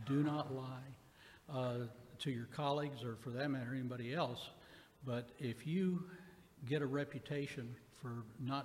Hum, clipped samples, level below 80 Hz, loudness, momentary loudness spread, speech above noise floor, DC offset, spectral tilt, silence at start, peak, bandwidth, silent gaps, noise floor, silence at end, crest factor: none; under 0.1%; -74 dBFS; -43 LUFS; 15 LU; 22 dB; under 0.1%; -7 dB/octave; 0 s; -24 dBFS; 16 kHz; none; -63 dBFS; 0 s; 18 dB